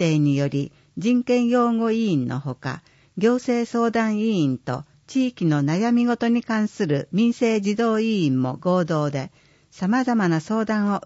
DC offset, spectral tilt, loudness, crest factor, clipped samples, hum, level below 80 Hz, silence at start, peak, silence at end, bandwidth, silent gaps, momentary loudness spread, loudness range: under 0.1%; -7 dB/octave; -22 LUFS; 14 dB; under 0.1%; none; -64 dBFS; 0 s; -8 dBFS; 0.05 s; 8 kHz; none; 9 LU; 2 LU